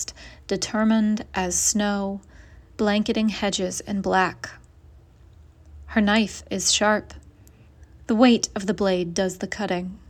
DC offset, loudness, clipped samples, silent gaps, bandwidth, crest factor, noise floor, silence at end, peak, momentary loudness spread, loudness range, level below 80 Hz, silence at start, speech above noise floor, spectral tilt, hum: under 0.1%; -23 LUFS; under 0.1%; none; 14.5 kHz; 22 dB; -50 dBFS; 0.15 s; -4 dBFS; 11 LU; 3 LU; -48 dBFS; 0 s; 28 dB; -3.5 dB/octave; none